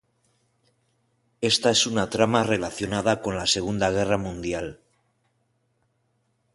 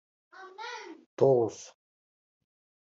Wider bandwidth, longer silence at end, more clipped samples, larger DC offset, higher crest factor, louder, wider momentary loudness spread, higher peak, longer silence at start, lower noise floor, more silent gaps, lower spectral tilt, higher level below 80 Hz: first, 11.5 kHz vs 7.8 kHz; first, 1.8 s vs 1.25 s; neither; neither; about the same, 22 dB vs 22 dB; first, -23 LUFS vs -28 LUFS; second, 10 LU vs 25 LU; first, -4 dBFS vs -10 dBFS; first, 1.4 s vs 0.4 s; second, -71 dBFS vs under -90 dBFS; second, none vs 1.06-1.17 s; second, -3.5 dB/octave vs -6.5 dB/octave; first, -50 dBFS vs -78 dBFS